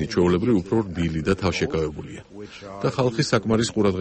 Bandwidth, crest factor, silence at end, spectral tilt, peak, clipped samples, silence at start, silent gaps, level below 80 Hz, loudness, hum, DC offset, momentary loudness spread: 8.8 kHz; 16 dB; 0 s; -6 dB/octave; -6 dBFS; under 0.1%; 0 s; none; -44 dBFS; -23 LUFS; none; under 0.1%; 17 LU